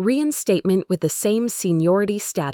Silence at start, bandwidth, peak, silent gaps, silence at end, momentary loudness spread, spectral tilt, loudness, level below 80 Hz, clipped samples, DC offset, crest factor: 0 s; 19.5 kHz; -6 dBFS; none; 0 s; 4 LU; -5.5 dB/octave; -20 LUFS; -62 dBFS; under 0.1%; under 0.1%; 14 dB